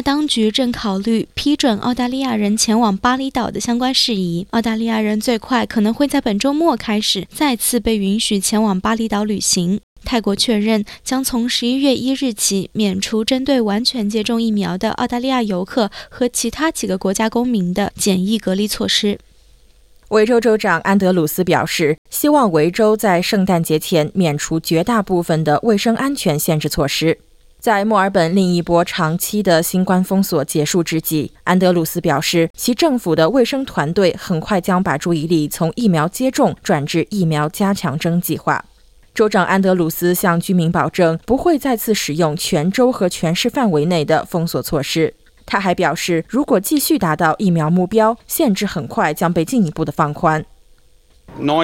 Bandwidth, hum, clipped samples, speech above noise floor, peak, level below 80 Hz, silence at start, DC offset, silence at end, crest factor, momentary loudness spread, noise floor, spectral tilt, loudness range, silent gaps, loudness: 17 kHz; none; under 0.1%; 33 dB; -2 dBFS; -44 dBFS; 0 s; under 0.1%; 0 s; 14 dB; 5 LU; -50 dBFS; -4.5 dB/octave; 2 LU; 9.83-9.96 s, 21.98-22.05 s, 32.50-32.54 s; -16 LUFS